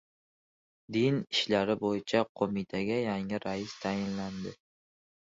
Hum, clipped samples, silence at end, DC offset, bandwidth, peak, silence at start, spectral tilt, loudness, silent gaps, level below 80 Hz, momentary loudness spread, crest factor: none; under 0.1%; 0.8 s; under 0.1%; 7.8 kHz; -12 dBFS; 0.9 s; -5.5 dB/octave; -32 LUFS; 2.29-2.35 s; -64 dBFS; 8 LU; 20 dB